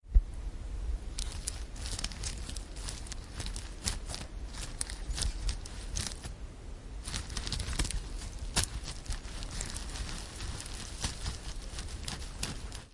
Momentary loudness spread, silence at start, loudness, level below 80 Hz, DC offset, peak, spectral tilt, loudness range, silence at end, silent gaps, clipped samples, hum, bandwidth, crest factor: 9 LU; 0.05 s; -39 LUFS; -38 dBFS; under 0.1%; -8 dBFS; -3 dB/octave; 3 LU; 0 s; none; under 0.1%; none; 11.5 kHz; 28 dB